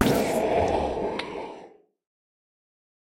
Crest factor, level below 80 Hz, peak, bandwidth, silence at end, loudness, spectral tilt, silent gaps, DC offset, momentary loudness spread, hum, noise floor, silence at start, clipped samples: 22 dB; -46 dBFS; -6 dBFS; 16.5 kHz; 1.35 s; -26 LUFS; -5.5 dB/octave; none; under 0.1%; 15 LU; none; -50 dBFS; 0 s; under 0.1%